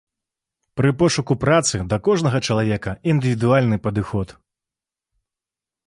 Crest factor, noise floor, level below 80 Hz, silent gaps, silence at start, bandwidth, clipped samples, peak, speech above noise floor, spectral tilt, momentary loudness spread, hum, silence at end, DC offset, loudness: 18 dB; -89 dBFS; -46 dBFS; none; 0.75 s; 11.5 kHz; under 0.1%; -4 dBFS; 70 dB; -5.5 dB/octave; 7 LU; none; 1.55 s; under 0.1%; -19 LUFS